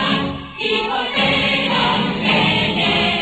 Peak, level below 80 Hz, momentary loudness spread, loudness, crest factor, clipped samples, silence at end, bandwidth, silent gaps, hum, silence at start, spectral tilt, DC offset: -4 dBFS; -42 dBFS; 5 LU; -16 LUFS; 14 dB; under 0.1%; 0 s; 9 kHz; none; none; 0 s; -5 dB/octave; under 0.1%